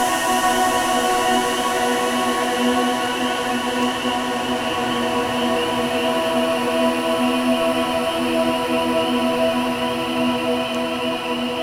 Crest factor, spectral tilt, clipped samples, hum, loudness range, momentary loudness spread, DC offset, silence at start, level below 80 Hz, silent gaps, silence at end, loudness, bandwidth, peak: 14 dB; -3 dB/octave; under 0.1%; none; 2 LU; 4 LU; under 0.1%; 0 s; -50 dBFS; none; 0 s; -20 LUFS; 17 kHz; -6 dBFS